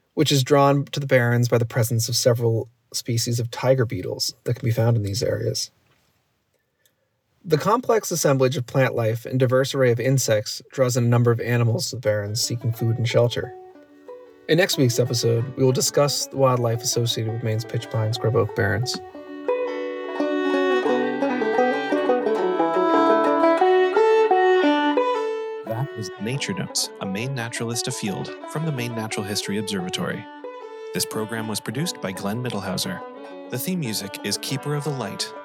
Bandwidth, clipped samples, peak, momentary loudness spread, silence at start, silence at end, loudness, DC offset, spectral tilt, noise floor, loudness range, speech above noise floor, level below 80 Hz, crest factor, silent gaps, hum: over 20 kHz; under 0.1%; -4 dBFS; 11 LU; 0.15 s; 0 s; -22 LUFS; under 0.1%; -5 dB/octave; -70 dBFS; 8 LU; 48 dB; -68 dBFS; 18 dB; none; none